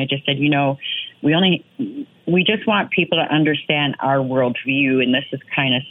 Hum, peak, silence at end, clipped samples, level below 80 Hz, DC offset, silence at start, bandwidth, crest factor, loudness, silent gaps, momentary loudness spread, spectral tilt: none; -2 dBFS; 0 s; under 0.1%; -66 dBFS; under 0.1%; 0 s; 4 kHz; 16 dB; -18 LUFS; none; 7 LU; -9 dB/octave